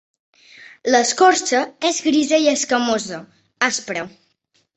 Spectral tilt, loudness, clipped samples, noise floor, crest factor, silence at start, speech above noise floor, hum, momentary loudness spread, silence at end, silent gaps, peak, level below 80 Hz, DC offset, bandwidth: -2 dB/octave; -18 LUFS; under 0.1%; -65 dBFS; 18 dB; 0.6 s; 47 dB; none; 14 LU; 0.65 s; none; -2 dBFS; -66 dBFS; under 0.1%; 8.4 kHz